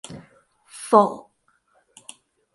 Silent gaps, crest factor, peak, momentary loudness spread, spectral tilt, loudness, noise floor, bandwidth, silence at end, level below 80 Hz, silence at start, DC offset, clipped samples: none; 24 dB; 0 dBFS; 27 LU; -5.5 dB/octave; -19 LUFS; -65 dBFS; 11.5 kHz; 1.35 s; -70 dBFS; 0.1 s; under 0.1%; under 0.1%